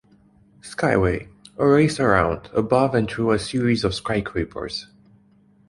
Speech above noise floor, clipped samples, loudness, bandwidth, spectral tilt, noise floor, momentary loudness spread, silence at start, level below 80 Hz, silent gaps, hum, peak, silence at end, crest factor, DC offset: 36 dB; under 0.1%; -21 LUFS; 11.5 kHz; -6 dB/octave; -56 dBFS; 13 LU; 0.65 s; -42 dBFS; none; none; -2 dBFS; 0.85 s; 20 dB; under 0.1%